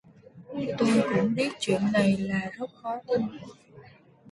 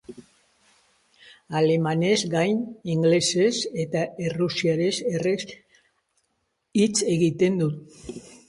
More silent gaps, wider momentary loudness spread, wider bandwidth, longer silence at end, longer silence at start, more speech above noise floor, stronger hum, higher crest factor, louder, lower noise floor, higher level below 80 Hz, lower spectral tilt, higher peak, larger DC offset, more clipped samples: neither; first, 13 LU vs 9 LU; about the same, 11.5 kHz vs 11.5 kHz; second, 0 s vs 0.15 s; first, 0.35 s vs 0.1 s; second, 27 dB vs 51 dB; neither; about the same, 18 dB vs 16 dB; second, -27 LUFS vs -23 LUFS; second, -53 dBFS vs -74 dBFS; about the same, -62 dBFS vs -62 dBFS; about the same, -6 dB/octave vs -5 dB/octave; about the same, -10 dBFS vs -8 dBFS; neither; neither